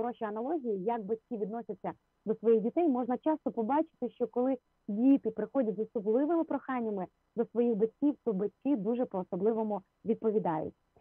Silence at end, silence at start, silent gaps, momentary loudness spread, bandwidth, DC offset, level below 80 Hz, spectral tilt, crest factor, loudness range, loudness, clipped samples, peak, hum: 0.3 s; 0 s; none; 10 LU; 3.7 kHz; under 0.1%; -76 dBFS; -11 dB/octave; 14 dB; 2 LU; -32 LUFS; under 0.1%; -16 dBFS; none